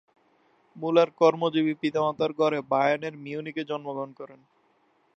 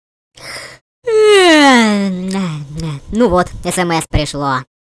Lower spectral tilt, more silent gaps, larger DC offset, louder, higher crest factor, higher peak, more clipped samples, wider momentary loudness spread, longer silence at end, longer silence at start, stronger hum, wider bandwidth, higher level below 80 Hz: first, -6.5 dB/octave vs -4.5 dB/octave; second, none vs 0.81-1.02 s; neither; second, -26 LUFS vs -12 LUFS; first, 20 dB vs 12 dB; second, -8 dBFS vs -2 dBFS; neither; second, 14 LU vs 19 LU; first, 0.85 s vs 0.2 s; first, 0.75 s vs 0.4 s; neither; second, 7.6 kHz vs 11 kHz; second, -74 dBFS vs -32 dBFS